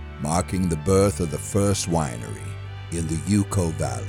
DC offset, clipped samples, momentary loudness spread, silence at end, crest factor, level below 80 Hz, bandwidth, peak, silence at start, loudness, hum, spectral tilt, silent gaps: under 0.1%; under 0.1%; 13 LU; 0 s; 16 dB; -40 dBFS; 16.5 kHz; -8 dBFS; 0 s; -24 LUFS; none; -5.5 dB/octave; none